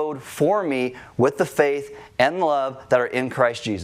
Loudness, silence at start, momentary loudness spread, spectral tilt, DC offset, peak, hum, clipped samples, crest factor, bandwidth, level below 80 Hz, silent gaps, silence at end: -22 LUFS; 0 s; 7 LU; -5.5 dB/octave; under 0.1%; -4 dBFS; none; under 0.1%; 18 dB; 16 kHz; -62 dBFS; none; 0 s